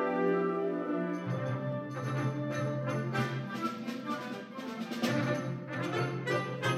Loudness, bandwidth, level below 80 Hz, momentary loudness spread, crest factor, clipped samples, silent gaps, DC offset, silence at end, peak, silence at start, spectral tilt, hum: -34 LUFS; 14 kHz; -76 dBFS; 7 LU; 16 dB; under 0.1%; none; under 0.1%; 0 s; -16 dBFS; 0 s; -6.5 dB/octave; none